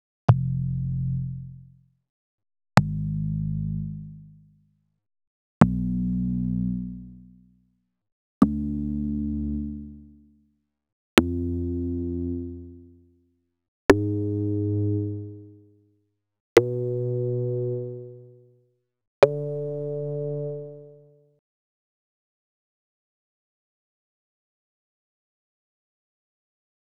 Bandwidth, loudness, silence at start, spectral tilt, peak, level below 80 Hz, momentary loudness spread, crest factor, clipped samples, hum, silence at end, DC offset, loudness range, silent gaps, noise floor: 15.5 kHz; -26 LUFS; 0.3 s; -7.5 dB/octave; 0 dBFS; -44 dBFS; 18 LU; 28 dB; under 0.1%; none; 6.05 s; under 0.1%; 3 LU; 2.09-2.38 s, 5.27-5.61 s, 8.12-8.41 s, 10.92-11.17 s, 13.68-13.89 s, 16.40-16.56 s, 19.07-19.22 s; -71 dBFS